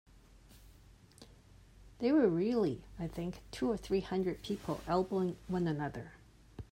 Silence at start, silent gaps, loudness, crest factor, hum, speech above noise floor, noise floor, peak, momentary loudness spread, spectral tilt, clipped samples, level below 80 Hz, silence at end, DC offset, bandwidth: 0.5 s; none; -35 LUFS; 18 dB; none; 26 dB; -60 dBFS; -18 dBFS; 13 LU; -7.5 dB/octave; under 0.1%; -58 dBFS; 0.05 s; under 0.1%; 16 kHz